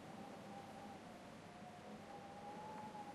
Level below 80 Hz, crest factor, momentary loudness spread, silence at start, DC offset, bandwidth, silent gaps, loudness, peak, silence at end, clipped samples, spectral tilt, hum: -80 dBFS; 12 dB; 4 LU; 0 s; under 0.1%; 13.5 kHz; none; -54 LUFS; -42 dBFS; 0 s; under 0.1%; -5 dB/octave; none